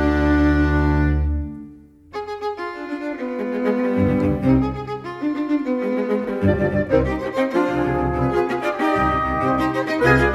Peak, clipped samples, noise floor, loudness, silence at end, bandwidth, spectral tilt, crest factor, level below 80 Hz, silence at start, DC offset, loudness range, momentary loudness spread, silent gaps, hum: -2 dBFS; under 0.1%; -43 dBFS; -20 LUFS; 0 s; 12.5 kHz; -8 dB/octave; 16 dB; -30 dBFS; 0 s; under 0.1%; 4 LU; 11 LU; none; none